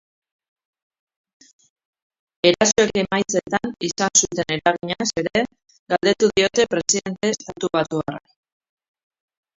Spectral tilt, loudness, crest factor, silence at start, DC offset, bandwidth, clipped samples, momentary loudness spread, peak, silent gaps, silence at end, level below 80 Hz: -2.5 dB/octave; -20 LUFS; 22 dB; 2.45 s; under 0.1%; 7.8 kHz; under 0.1%; 9 LU; 0 dBFS; 5.79-5.86 s; 1.4 s; -56 dBFS